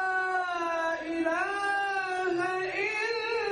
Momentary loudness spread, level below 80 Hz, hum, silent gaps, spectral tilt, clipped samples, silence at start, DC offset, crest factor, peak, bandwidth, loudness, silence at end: 2 LU; -66 dBFS; none; none; -3 dB/octave; under 0.1%; 0 s; under 0.1%; 14 dB; -16 dBFS; 10.5 kHz; -29 LUFS; 0 s